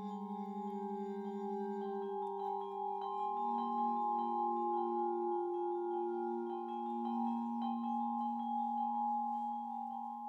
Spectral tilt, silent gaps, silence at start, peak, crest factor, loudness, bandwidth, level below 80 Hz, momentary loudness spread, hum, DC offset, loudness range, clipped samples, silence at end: -8.5 dB/octave; none; 0 s; -26 dBFS; 12 dB; -39 LUFS; 7.2 kHz; under -90 dBFS; 6 LU; none; under 0.1%; 3 LU; under 0.1%; 0 s